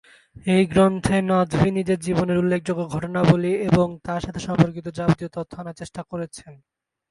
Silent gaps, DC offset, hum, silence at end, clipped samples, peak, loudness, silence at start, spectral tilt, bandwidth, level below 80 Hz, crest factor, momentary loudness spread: none; under 0.1%; none; 0.55 s; under 0.1%; -2 dBFS; -21 LUFS; 0.45 s; -7 dB/octave; 11.5 kHz; -46 dBFS; 20 dB; 14 LU